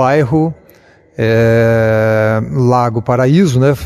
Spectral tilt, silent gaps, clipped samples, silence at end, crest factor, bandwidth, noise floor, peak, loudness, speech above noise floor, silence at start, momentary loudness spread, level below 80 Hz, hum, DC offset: -7.5 dB/octave; none; under 0.1%; 0 s; 12 dB; 14 kHz; -45 dBFS; 0 dBFS; -12 LUFS; 34 dB; 0 s; 5 LU; -40 dBFS; none; 0.1%